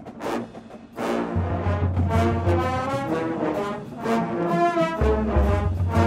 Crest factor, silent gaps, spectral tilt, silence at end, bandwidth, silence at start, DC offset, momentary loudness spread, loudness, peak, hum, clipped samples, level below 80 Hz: 16 dB; none; -7.5 dB/octave; 0 s; 12.5 kHz; 0 s; under 0.1%; 9 LU; -24 LUFS; -6 dBFS; none; under 0.1%; -32 dBFS